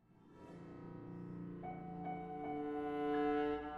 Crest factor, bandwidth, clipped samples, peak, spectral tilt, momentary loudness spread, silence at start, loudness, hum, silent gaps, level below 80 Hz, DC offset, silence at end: 16 dB; 5.4 kHz; under 0.1%; -26 dBFS; -8.5 dB/octave; 17 LU; 0.1 s; -43 LUFS; none; none; -66 dBFS; under 0.1%; 0 s